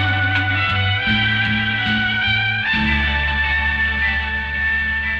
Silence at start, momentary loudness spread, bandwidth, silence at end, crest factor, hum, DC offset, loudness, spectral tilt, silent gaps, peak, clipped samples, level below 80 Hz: 0 s; 2 LU; 7.4 kHz; 0 s; 14 dB; none; under 0.1%; -17 LUFS; -6 dB/octave; none; -4 dBFS; under 0.1%; -30 dBFS